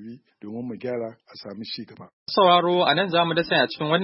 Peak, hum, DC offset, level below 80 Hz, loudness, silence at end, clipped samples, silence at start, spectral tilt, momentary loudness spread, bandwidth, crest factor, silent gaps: -4 dBFS; none; under 0.1%; -68 dBFS; -21 LUFS; 0 s; under 0.1%; 0 s; -9.5 dB/octave; 23 LU; 5.8 kHz; 18 dB; 2.13-2.26 s